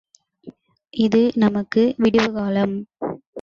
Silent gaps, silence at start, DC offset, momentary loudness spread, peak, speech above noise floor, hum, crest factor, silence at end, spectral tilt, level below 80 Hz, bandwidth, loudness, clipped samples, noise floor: 3.27-3.33 s; 0.45 s; under 0.1%; 13 LU; -4 dBFS; 26 dB; none; 16 dB; 0 s; -7 dB/octave; -54 dBFS; 7.2 kHz; -20 LUFS; under 0.1%; -44 dBFS